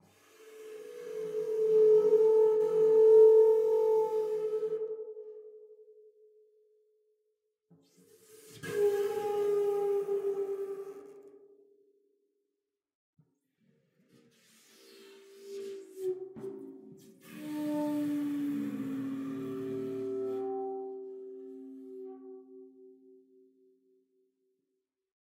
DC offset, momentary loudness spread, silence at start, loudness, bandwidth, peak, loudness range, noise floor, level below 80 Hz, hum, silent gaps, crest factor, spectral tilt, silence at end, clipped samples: under 0.1%; 24 LU; 0.45 s; -29 LUFS; 15 kHz; -14 dBFS; 22 LU; -87 dBFS; -90 dBFS; none; 12.95-13.13 s; 18 dB; -6.5 dB/octave; 2.6 s; under 0.1%